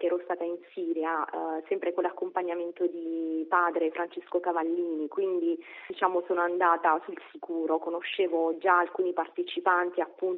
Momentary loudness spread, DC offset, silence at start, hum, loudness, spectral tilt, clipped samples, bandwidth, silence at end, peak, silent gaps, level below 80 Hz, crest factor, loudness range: 9 LU; under 0.1%; 0 s; none; -29 LUFS; -1 dB/octave; under 0.1%; 4.1 kHz; 0 s; -10 dBFS; none; -88 dBFS; 20 dB; 3 LU